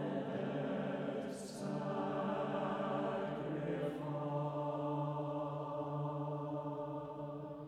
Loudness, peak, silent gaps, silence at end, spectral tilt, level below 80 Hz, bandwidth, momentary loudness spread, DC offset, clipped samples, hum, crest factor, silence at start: -40 LUFS; -26 dBFS; none; 0 s; -7.5 dB/octave; -72 dBFS; 12 kHz; 5 LU; under 0.1%; under 0.1%; none; 14 dB; 0 s